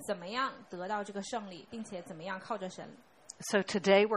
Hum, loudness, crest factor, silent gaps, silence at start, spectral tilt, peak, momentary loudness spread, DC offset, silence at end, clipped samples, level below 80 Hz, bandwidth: none; -35 LUFS; 22 dB; none; 0 s; -4 dB/octave; -12 dBFS; 15 LU; under 0.1%; 0 s; under 0.1%; -74 dBFS; 13.5 kHz